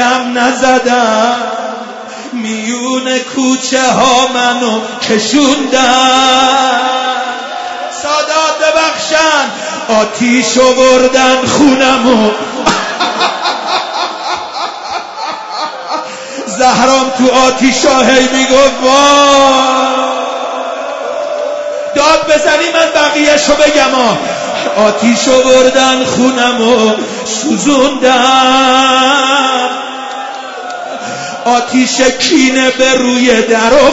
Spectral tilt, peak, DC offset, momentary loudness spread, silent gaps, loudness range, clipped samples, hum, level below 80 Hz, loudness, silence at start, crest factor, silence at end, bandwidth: -2.5 dB/octave; 0 dBFS; under 0.1%; 12 LU; none; 5 LU; 0.3%; none; -42 dBFS; -9 LUFS; 0 s; 10 dB; 0 s; 11 kHz